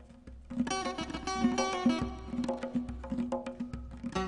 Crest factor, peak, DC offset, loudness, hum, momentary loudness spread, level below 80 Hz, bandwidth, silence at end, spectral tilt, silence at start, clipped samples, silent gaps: 18 dB; -16 dBFS; under 0.1%; -34 LUFS; none; 12 LU; -48 dBFS; 10.5 kHz; 0 s; -4.5 dB/octave; 0 s; under 0.1%; none